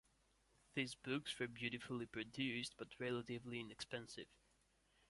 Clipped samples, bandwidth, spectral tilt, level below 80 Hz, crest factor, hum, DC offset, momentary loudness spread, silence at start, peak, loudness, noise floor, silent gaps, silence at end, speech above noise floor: under 0.1%; 11.5 kHz; -4.5 dB/octave; -76 dBFS; 22 dB; none; under 0.1%; 7 LU; 0.75 s; -28 dBFS; -47 LUFS; -78 dBFS; none; 0.75 s; 31 dB